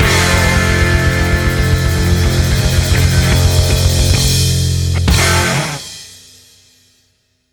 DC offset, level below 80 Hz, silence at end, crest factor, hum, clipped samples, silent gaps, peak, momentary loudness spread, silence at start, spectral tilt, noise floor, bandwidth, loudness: under 0.1%; -20 dBFS; 1.4 s; 12 dB; none; under 0.1%; none; 0 dBFS; 4 LU; 0 s; -4 dB/octave; -60 dBFS; over 20 kHz; -13 LUFS